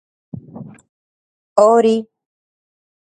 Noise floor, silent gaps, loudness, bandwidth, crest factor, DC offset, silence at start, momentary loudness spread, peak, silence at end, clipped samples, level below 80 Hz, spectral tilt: -37 dBFS; 0.89-1.56 s; -14 LUFS; 9.4 kHz; 20 dB; under 0.1%; 0.35 s; 25 LU; 0 dBFS; 1.05 s; under 0.1%; -62 dBFS; -6 dB/octave